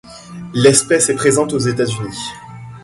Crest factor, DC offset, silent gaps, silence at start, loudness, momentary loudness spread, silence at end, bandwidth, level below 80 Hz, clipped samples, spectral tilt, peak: 16 dB; under 0.1%; none; 0.05 s; -14 LUFS; 22 LU; 0.05 s; 11.5 kHz; -48 dBFS; under 0.1%; -4 dB/octave; 0 dBFS